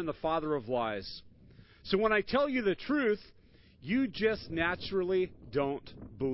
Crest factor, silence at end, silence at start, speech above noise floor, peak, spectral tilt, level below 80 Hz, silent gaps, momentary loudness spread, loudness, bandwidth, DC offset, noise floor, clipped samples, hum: 18 dB; 0 s; 0 s; 26 dB; -16 dBFS; -9.5 dB/octave; -56 dBFS; none; 13 LU; -32 LUFS; 5.8 kHz; under 0.1%; -57 dBFS; under 0.1%; none